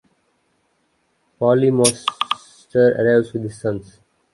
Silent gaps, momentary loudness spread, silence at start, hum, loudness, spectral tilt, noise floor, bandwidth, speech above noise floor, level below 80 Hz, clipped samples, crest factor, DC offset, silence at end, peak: none; 12 LU; 1.4 s; none; -18 LUFS; -4.5 dB/octave; -66 dBFS; 11.5 kHz; 49 dB; -58 dBFS; under 0.1%; 20 dB; under 0.1%; 0.55 s; 0 dBFS